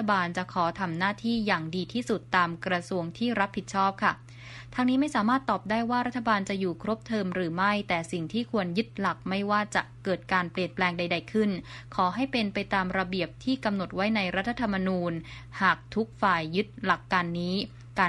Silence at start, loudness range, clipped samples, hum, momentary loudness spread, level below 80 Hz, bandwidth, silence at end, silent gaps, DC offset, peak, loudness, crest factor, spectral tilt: 0 s; 1 LU; under 0.1%; none; 6 LU; -56 dBFS; 11.5 kHz; 0 s; none; under 0.1%; -10 dBFS; -28 LUFS; 20 dB; -5.5 dB/octave